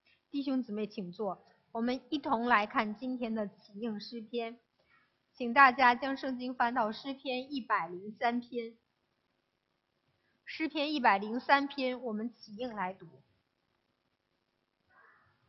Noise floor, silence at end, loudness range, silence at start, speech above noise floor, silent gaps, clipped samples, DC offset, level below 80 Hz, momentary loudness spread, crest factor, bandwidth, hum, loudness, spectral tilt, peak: -81 dBFS; 2.4 s; 9 LU; 0.35 s; 48 dB; none; under 0.1%; under 0.1%; -76 dBFS; 14 LU; 26 dB; 6.2 kHz; none; -32 LUFS; -2 dB/octave; -8 dBFS